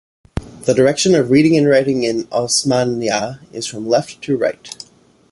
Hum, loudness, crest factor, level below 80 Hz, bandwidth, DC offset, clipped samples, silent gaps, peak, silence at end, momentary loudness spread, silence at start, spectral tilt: none; -16 LUFS; 14 dB; -44 dBFS; 11.5 kHz; under 0.1%; under 0.1%; none; -2 dBFS; 0.55 s; 17 LU; 0.35 s; -4.5 dB/octave